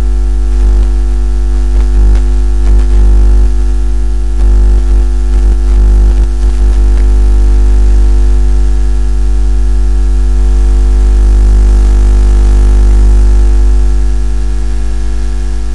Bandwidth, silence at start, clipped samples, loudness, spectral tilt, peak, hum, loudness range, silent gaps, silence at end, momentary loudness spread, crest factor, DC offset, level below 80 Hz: 8 kHz; 0 s; under 0.1%; -11 LUFS; -7 dB/octave; 0 dBFS; none; 2 LU; none; 0 s; 5 LU; 8 dB; 20%; -6 dBFS